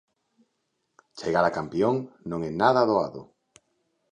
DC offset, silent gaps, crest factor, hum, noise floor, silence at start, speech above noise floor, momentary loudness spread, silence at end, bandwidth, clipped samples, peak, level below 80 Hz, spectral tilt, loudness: under 0.1%; none; 22 dB; none; -77 dBFS; 1.15 s; 52 dB; 13 LU; 0.9 s; 9.6 kHz; under 0.1%; -4 dBFS; -60 dBFS; -6.5 dB/octave; -25 LUFS